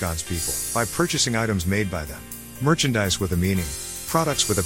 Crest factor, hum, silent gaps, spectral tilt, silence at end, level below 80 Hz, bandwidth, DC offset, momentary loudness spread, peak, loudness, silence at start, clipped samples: 20 dB; none; none; -4 dB/octave; 0 s; -42 dBFS; 17 kHz; 0.3%; 9 LU; -4 dBFS; -23 LUFS; 0 s; under 0.1%